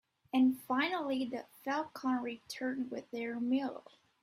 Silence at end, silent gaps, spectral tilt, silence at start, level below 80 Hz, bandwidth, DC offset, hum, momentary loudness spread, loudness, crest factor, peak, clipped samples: 0.45 s; none; -4.5 dB/octave; 0.35 s; -80 dBFS; 15.5 kHz; under 0.1%; none; 11 LU; -36 LUFS; 16 dB; -20 dBFS; under 0.1%